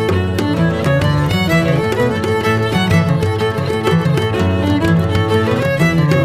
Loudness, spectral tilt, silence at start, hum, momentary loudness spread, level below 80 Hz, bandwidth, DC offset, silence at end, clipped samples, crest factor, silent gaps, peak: -15 LUFS; -6.5 dB/octave; 0 s; none; 3 LU; -36 dBFS; 15.5 kHz; under 0.1%; 0 s; under 0.1%; 14 dB; none; 0 dBFS